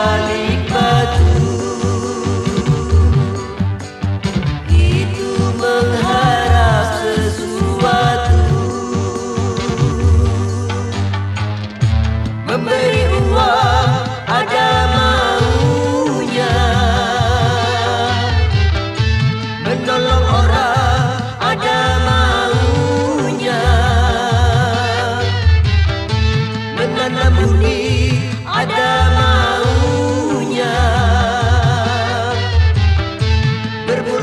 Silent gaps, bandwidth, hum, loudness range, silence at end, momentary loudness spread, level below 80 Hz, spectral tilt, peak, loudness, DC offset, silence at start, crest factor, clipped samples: none; 11.5 kHz; none; 3 LU; 0 s; 6 LU; -24 dBFS; -5.5 dB/octave; 0 dBFS; -15 LUFS; under 0.1%; 0 s; 12 dB; under 0.1%